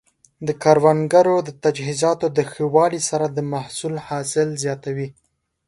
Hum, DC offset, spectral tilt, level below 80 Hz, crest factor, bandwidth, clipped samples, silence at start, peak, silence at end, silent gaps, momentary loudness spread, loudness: none; under 0.1%; -5 dB/octave; -60 dBFS; 20 dB; 11.5 kHz; under 0.1%; 0.4 s; 0 dBFS; 0.55 s; none; 12 LU; -20 LUFS